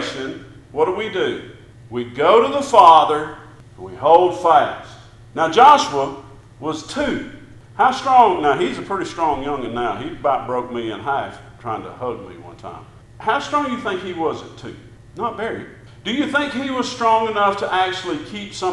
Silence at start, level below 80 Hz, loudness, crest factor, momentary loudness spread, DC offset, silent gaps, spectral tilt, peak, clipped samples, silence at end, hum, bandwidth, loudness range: 0 s; -50 dBFS; -18 LUFS; 18 dB; 20 LU; under 0.1%; none; -4.5 dB/octave; 0 dBFS; under 0.1%; 0 s; none; 11.5 kHz; 10 LU